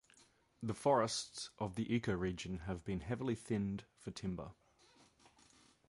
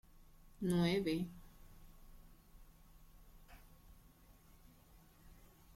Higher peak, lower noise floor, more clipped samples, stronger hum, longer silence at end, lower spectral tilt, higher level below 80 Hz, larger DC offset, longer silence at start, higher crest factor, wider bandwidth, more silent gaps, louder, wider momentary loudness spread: first, -20 dBFS vs -24 dBFS; first, -70 dBFS vs -64 dBFS; neither; neither; first, 1.35 s vs 0.4 s; about the same, -5.5 dB/octave vs -6.5 dB/octave; about the same, -60 dBFS vs -62 dBFS; neither; first, 0.6 s vs 0.2 s; about the same, 22 dB vs 20 dB; second, 11.5 kHz vs 16 kHz; neither; about the same, -40 LUFS vs -38 LUFS; second, 13 LU vs 30 LU